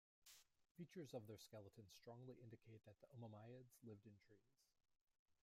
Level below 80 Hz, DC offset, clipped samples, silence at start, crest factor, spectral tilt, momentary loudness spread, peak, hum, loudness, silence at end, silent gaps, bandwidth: under -90 dBFS; under 0.1%; under 0.1%; 0.2 s; 22 dB; -6 dB/octave; 10 LU; -42 dBFS; none; -62 LUFS; 0.1 s; 0.71-0.75 s, 5.01-5.06 s, 5.19-5.26 s; 15.5 kHz